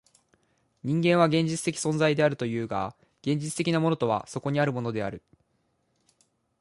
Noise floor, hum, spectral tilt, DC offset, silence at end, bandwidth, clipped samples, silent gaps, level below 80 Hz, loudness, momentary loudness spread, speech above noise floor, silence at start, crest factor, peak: -73 dBFS; none; -5.5 dB/octave; under 0.1%; 1.45 s; 11.5 kHz; under 0.1%; none; -64 dBFS; -27 LUFS; 12 LU; 47 dB; 0.85 s; 20 dB; -8 dBFS